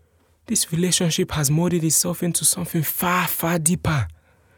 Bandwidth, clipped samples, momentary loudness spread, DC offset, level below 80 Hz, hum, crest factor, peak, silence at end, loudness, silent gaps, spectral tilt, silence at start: over 20 kHz; under 0.1%; 5 LU; under 0.1%; -48 dBFS; none; 18 dB; -4 dBFS; 0.45 s; -20 LUFS; none; -3.5 dB/octave; 0.5 s